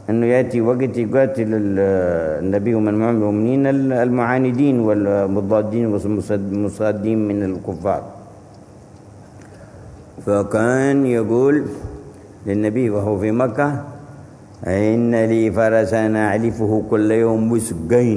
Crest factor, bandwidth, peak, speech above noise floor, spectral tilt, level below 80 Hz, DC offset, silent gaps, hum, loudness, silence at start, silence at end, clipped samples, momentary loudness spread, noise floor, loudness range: 16 dB; 11 kHz; -2 dBFS; 25 dB; -8 dB/octave; -48 dBFS; under 0.1%; none; none; -18 LUFS; 0 s; 0 s; under 0.1%; 7 LU; -42 dBFS; 6 LU